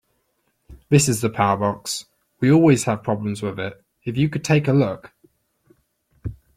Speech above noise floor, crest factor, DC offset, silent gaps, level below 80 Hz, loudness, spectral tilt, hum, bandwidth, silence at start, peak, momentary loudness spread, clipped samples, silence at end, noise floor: 50 dB; 20 dB; under 0.1%; none; -50 dBFS; -20 LUFS; -5.5 dB/octave; none; 15.5 kHz; 0.7 s; -2 dBFS; 17 LU; under 0.1%; 0.25 s; -69 dBFS